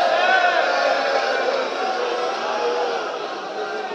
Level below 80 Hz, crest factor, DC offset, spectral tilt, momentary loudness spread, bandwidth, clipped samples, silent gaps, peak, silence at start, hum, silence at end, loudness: -80 dBFS; 16 dB; under 0.1%; -1.5 dB/octave; 10 LU; 9.4 kHz; under 0.1%; none; -4 dBFS; 0 s; none; 0 s; -21 LUFS